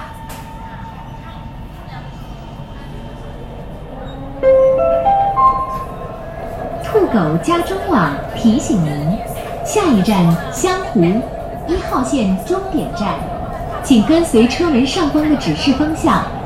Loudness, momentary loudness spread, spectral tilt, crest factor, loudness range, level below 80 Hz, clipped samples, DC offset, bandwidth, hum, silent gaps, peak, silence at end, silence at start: -15 LUFS; 19 LU; -6 dB/octave; 16 dB; 16 LU; -32 dBFS; under 0.1%; under 0.1%; 16.5 kHz; none; none; 0 dBFS; 0 s; 0 s